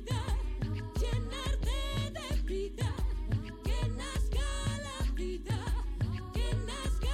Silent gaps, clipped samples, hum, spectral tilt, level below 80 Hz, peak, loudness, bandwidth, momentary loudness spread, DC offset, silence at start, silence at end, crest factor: none; under 0.1%; none; -5.5 dB/octave; -34 dBFS; -22 dBFS; -36 LUFS; 14.5 kHz; 2 LU; under 0.1%; 0 s; 0 s; 10 dB